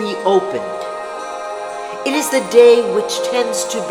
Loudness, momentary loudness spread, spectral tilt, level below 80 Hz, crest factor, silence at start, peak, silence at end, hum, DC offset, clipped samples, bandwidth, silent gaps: -16 LUFS; 16 LU; -3 dB/octave; -62 dBFS; 16 dB; 0 s; 0 dBFS; 0 s; none; under 0.1%; under 0.1%; 16 kHz; none